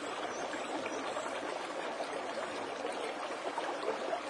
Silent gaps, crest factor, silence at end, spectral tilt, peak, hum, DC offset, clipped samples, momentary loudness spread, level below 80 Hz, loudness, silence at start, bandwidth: none; 16 dB; 0 s; -2.5 dB/octave; -22 dBFS; none; under 0.1%; under 0.1%; 2 LU; -80 dBFS; -38 LUFS; 0 s; 11.5 kHz